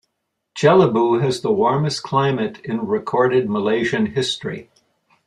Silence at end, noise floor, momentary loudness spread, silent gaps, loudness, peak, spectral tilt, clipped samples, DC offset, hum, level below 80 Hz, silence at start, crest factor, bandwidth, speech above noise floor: 0.65 s; -75 dBFS; 11 LU; none; -18 LUFS; -2 dBFS; -6 dB/octave; under 0.1%; under 0.1%; none; -58 dBFS; 0.55 s; 18 dB; 11 kHz; 57 dB